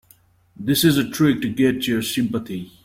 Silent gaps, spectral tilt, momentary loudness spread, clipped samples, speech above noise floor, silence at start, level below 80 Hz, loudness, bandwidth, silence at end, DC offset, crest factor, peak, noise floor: none; -5 dB/octave; 10 LU; under 0.1%; 36 dB; 0.6 s; -52 dBFS; -20 LUFS; 16.5 kHz; 0.15 s; under 0.1%; 16 dB; -4 dBFS; -55 dBFS